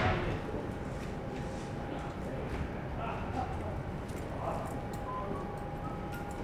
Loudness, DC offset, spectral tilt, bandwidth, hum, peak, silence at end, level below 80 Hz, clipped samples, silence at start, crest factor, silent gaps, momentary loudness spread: -38 LUFS; under 0.1%; -7 dB/octave; 15.5 kHz; none; -18 dBFS; 0 s; -46 dBFS; under 0.1%; 0 s; 18 dB; none; 3 LU